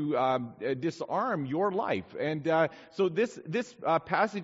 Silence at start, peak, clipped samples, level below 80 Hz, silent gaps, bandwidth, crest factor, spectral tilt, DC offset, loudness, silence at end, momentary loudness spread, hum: 0 s; -12 dBFS; under 0.1%; -72 dBFS; none; 8 kHz; 18 dB; -5 dB/octave; under 0.1%; -30 LUFS; 0 s; 5 LU; none